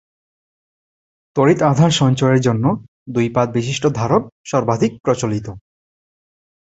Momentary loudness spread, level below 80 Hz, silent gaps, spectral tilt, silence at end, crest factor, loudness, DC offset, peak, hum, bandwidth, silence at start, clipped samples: 10 LU; -50 dBFS; 2.88-3.06 s, 4.32-4.44 s, 5.00-5.04 s; -6 dB/octave; 1.05 s; 16 dB; -17 LUFS; under 0.1%; -2 dBFS; none; 8.2 kHz; 1.35 s; under 0.1%